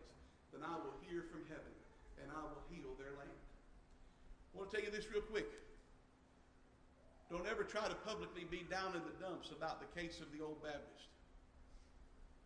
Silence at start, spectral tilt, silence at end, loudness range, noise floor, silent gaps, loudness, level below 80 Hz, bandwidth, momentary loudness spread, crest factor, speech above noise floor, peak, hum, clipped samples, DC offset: 0 s; -4.5 dB/octave; 0 s; 7 LU; -69 dBFS; none; -48 LUFS; -64 dBFS; 10.5 kHz; 24 LU; 22 dB; 21 dB; -30 dBFS; none; under 0.1%; under 0.1%